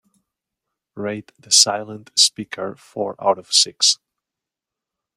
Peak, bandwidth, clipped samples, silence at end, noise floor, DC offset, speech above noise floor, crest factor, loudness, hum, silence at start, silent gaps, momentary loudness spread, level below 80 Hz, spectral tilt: 0 dBFS; 16 kHz; under 0.1%; 1.25 s; -86 dBFS; under 0.1%; 66 dB; 22 dB; -16 LUFS; none; 0.95 s; none; 16 LU; -72 dBFS; -0.5 dB/octave